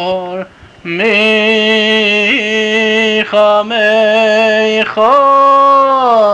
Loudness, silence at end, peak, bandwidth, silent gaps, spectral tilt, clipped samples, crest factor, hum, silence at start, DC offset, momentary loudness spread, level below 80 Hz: -9 LUFS; 0 s; -2 dBFS; 9.4 kHz; none; -4 dB/octave; under 0.1%; 8 dB; none; 0 s; under 0.1%; 10 LU; -54 dBFS